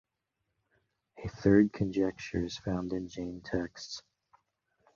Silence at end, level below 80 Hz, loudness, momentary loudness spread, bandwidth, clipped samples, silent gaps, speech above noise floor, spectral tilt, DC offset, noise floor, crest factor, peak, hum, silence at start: 0.95 s; -54 dBFS; -31 LUFS; 18 LU; 7.4 kHz; under 0.1%; none; 53 dB; -6.5 dB/octave; under 0.1%; -84 dBFS; 22 dB; -12 dBFS; none; 1.15 s